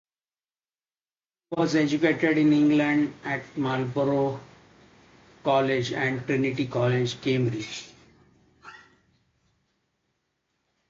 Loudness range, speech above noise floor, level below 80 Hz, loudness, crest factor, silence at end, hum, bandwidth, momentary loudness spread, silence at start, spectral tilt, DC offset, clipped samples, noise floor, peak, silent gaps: 8 LU; over 66 dB; -64 dBFS; -25 LUFS; 18 dB; 2.15 s; none; 7.6 kHz; 11 LU; 1.5 s; -6.5 dB/octave; under 0.1%; under 0.1%; under -90 dBFS; -8 dBFS; none